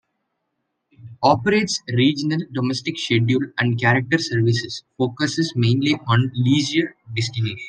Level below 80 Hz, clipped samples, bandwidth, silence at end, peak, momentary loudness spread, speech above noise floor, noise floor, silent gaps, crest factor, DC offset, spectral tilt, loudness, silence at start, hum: -60 dBFS; under 0.1%; 9.6 kHz; 0 s; -2 dBFS; 7 LU; 56 dB; -75 dBFS; none; 18 dB; under 0.1%; -5.5 dB/octave; -20 LUFS; 1 s; none